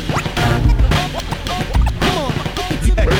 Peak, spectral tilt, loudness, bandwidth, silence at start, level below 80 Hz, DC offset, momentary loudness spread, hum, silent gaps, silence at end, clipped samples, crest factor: -4 dBFS; -5.5 dB/octave; -18 LUFS; 16.5 kHz; 0 s; -18 dBFS; under 0.1%; 6 LU; none; none; 0 s; under 0.1%; 12 dB